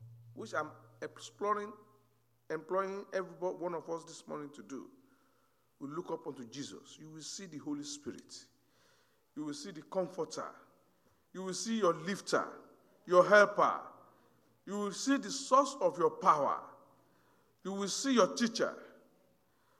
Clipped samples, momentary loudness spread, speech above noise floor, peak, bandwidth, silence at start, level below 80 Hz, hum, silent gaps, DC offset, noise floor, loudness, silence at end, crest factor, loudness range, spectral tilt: under 0.1%; 19 LU; 40 dB; -12 dBFS; 15 kHz; 0 s; -88 dBFS; none; none; under 0.1%; -74 dBFS; -34 LUFS; 0.9 s; 24 dB; 14 LU; -3.5 dB/octave